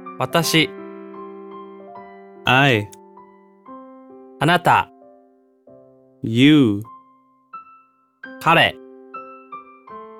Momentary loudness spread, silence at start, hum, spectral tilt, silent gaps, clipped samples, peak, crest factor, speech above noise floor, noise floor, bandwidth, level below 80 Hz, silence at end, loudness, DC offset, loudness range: 26 LU; 0 s; none; -5 dB/octave; none; under 0.1%; -2 dBFS; 20 dB; 40 dB; -56 dBFS; 17 kHz; -60 dBFS; 0.15 s; -17 LUFS; under 0.1%; 4 LU